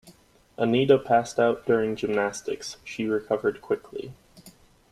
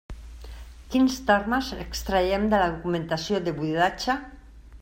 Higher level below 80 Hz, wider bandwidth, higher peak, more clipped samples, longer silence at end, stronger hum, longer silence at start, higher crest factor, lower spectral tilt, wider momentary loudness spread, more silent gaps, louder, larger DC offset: second, -62 dBFS vs -42 dBFS; second, 13 kHz vs 16 kHz; about the same, -6 dBFS vs -6 dBFS; neither; first, 0.4 s vs 0.05 s; neither; about the same, 0.05 s vs 0.1 s; about the same, 20 dB vs 20 dB; about the same, -5.5 dB/octave vs -5 dB/octave; second, 14 LU vs 21 LU; neither; about the same, -25 LUFS vs -25 LUFS; neither